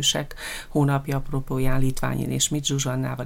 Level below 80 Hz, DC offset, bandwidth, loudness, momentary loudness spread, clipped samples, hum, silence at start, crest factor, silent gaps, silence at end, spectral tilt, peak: -34 dBFS; under 0.1%; 16.5 kHz; -25 LUFS; 6 LU; under 0.1%; none; 0 s; 16 dB; none; 0 s; -4 dB/octave; -8 dBFS